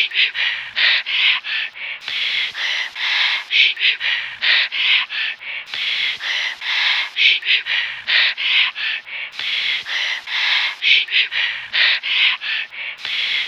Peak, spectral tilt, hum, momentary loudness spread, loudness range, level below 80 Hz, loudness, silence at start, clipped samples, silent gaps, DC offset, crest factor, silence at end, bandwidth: 0 dBFS; 2 dB/octave; none; 9 LU; 2 LU; -72 dBFS; -16 LUFS; 0 s; under 0.1%; none; under 0.1%; 18 dB; 0 s; 14 kHz